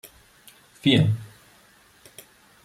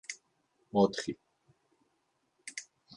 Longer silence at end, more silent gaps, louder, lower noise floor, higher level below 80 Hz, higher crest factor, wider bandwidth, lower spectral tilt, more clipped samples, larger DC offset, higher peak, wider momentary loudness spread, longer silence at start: first, 1.4 s vs 0.35 s; neither; first, -22 LUFS vs -32 LUFS; second, -56 dBFS vs -78 dBFS; first, -60 dBFS vs -72 dBFS; about the same, 20 dB vs 24 dB; first, 15 kHz vs 11.5 kHz; first, -6.5 dB/octave vs -5 dB/octave; neither; neither; first, -8 dBFS vs -14 dBFS; first, 27 LU vs 20 LU; first, 0.85 s vs 0.1 s